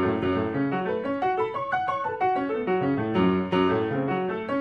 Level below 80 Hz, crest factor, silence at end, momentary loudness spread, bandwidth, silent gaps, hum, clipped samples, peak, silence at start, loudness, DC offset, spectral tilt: -60 dBFS; 14 dB; 0 s; 4 LU; 6.4 kHz; none; none; under 0.1%; -12 dBFS; 0 s; -26 LUFS; under 0.1%; -8.5 dB/octave